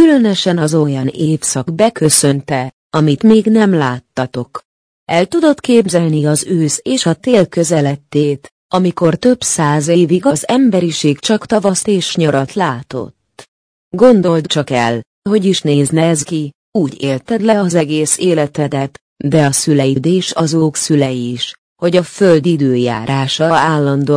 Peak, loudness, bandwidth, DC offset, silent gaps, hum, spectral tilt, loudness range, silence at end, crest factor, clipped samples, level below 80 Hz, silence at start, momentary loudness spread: 0 dBFS; -13 LUFS; 10.5 kHz; under 0.1%; 2.73-2.90 s, 4.65-5.06 s, 8.51-8.69 s, 13.48-13.91 s, 15.06-15.22 s, 16.55-16.72 s, 19.01-19.16 s, 21.58-21.76 s; none; -5 dB/octave; 2 LU; 0 s; 12 dB; under 0.1%; -52 dBFS; 0 s; 9 LU